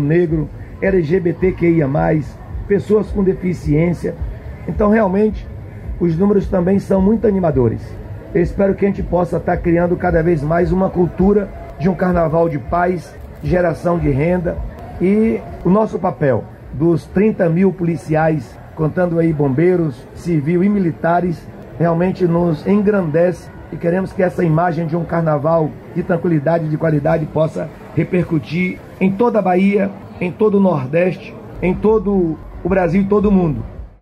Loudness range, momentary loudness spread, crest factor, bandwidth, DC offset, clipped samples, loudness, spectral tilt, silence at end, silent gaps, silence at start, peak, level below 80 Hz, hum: 2 LU; 10 LU; 12 dB; 9.8 kHz; under 0.1%; under 0.1%; -16 LUFS; -9.5 dB/octave; 0.1 s; none; 0 s; -4 dBFS; -34 dBFS; none